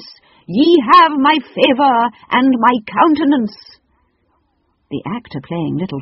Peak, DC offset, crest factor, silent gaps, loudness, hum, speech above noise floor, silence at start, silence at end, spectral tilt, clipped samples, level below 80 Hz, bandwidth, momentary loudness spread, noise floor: 0 dBFS; under 0.1%; 14 dB; none; -13 LUFS; none; 49 dB; 0 s; 0 s; -3 dB/octave; under 0.1%; -56 dBFS; 6 kHz; 16 LU; -63 dBFS